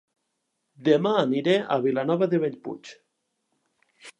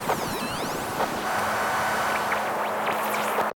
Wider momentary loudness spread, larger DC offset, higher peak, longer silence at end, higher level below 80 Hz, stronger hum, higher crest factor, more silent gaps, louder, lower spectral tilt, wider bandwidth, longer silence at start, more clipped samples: first, 15 LU vs 4 LU; neither; first, -6 dBFS vs -12 dBFS; about the same, 0.1 s vs 0 s; second, -80 dBFS vs -56 dBFS; neither; first, 20 dB vs 14 dB; neither; about the same, -24 LUFS vs -26 LUFS; first, -7 dB/octave vs -3 dB/octave; second, 11 kHz vs 18 kHz; first, 0.8 s vs 0 s; neither